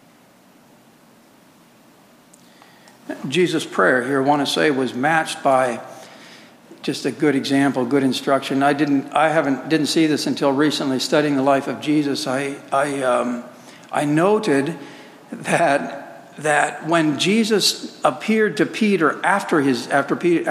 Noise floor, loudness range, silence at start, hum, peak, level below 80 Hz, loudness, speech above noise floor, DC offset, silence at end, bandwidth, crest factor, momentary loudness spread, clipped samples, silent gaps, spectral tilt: -51 dBFS; 3 LU; 3.1 s; none; -2 dBFS; -72 dBFS; -19 LUFS; 32 dB; under 0.1%; 0 s; 15.5 kHz; 18 dB; 10 LU; under 0.1%; none; -4.5 dB/octave